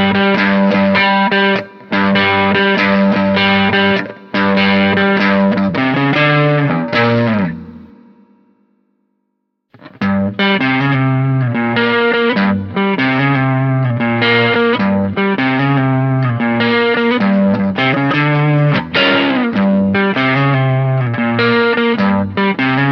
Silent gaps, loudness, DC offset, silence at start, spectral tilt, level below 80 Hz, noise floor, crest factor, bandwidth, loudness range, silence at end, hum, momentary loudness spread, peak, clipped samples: none; -13 LUFS; under 0.1%; 0 s; -8 dB/octave; -52 dBFS; -69 dBFS; 12 dB; 6.2 kHz; 5 LU; 0 s; none; 4 LU; 0 dBFS; under 0.1%